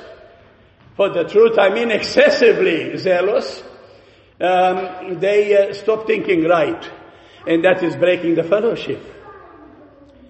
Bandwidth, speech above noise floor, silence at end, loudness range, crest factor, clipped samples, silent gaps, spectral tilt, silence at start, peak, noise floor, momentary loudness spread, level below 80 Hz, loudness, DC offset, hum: 8.4 kHz; 33 dB; 0.9 s; 3 LU; 16 dB; under 0.1%; none; -5.5 dB/octave; 0 s; 0 dBFS; -49 dBFS; 13 LU; -56 dBFS; -16 LUFS; under 0.1%; none